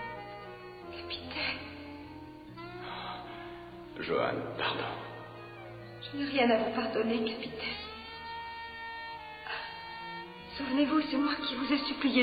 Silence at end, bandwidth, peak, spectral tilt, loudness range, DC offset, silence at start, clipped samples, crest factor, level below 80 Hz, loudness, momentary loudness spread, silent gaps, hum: 0 s; 5 kHz; -14 dBFS; -7 dB/octave; 7 LU; under 0.1%; 0 s; under 0.1%; 20 dB; -62 dBFS; -34 LUFS; 17 LU; none; none